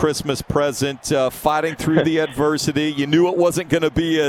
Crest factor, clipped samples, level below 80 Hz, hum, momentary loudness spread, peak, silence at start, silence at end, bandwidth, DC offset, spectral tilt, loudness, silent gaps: 16 dB; under 0.1%; -44 dBFS; none; 4 LU; -2 dBFS; 0 s; 0 s; 16.5 kHz; under 0.1%; -5 dB/octave; -19 LUFS; none